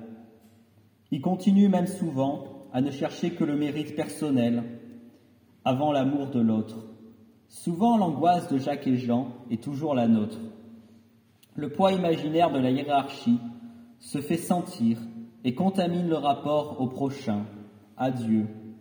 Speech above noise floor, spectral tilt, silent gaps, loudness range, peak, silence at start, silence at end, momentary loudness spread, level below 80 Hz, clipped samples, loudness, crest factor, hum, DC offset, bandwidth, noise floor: 34 dB; -7 dB/octave; none; 3 LU; -8 dBFS; 0 s; 0 s; 15 LU; -78 dBFS; under 0.1%; -27 LUFS; 18 dB; none; under 0.1%; over 20 kHz; -60 dBFS